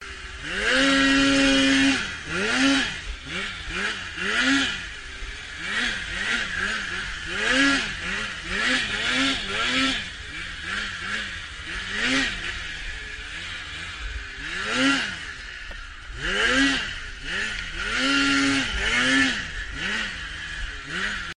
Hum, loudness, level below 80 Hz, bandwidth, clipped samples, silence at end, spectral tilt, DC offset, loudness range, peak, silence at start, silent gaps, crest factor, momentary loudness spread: none; -24 LUFS; -40 dBFS; 10 kHz; under 0.1%; 0.05 s; -2.5 dB/octave; under 0.1%; 7 LU; -8 dBFS; 0 s; none; 18 dB; 15 LU